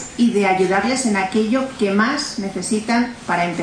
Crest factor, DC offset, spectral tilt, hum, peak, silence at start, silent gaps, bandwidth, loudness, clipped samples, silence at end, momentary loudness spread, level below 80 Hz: 14 dB; under 0.1%; -4.5 dB/octave; none; -4 dBFS; 0 s; none; 10 kHz; -19 LUFS; under 0.1%; 0 s; 6 LU; -52 dBFS